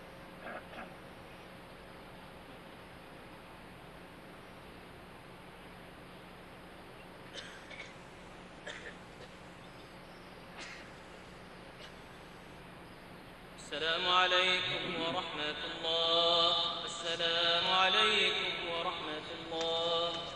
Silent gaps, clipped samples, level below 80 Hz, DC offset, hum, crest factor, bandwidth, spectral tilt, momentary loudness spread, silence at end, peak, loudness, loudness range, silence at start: none; under 0.1%; -64 dBFS; under 0.1%; none; 24 dB; 13 kHz; -2.5 dB/octave; 24 LU; 0 s; -14 dBFS; -31 LUFS; 22 LU; 0 s